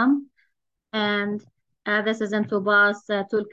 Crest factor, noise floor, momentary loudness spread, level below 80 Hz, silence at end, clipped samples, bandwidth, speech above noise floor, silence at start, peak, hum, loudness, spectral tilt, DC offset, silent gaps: 16 dB; -73 dBFS; 12 LU; -74 dBFS; 0 s; under 0.1%; 7.8 kHz; 50 dB; 0 s; -8 dBFS; none; -23 LUFS; -5.5 dB/octave; under 0.1%; none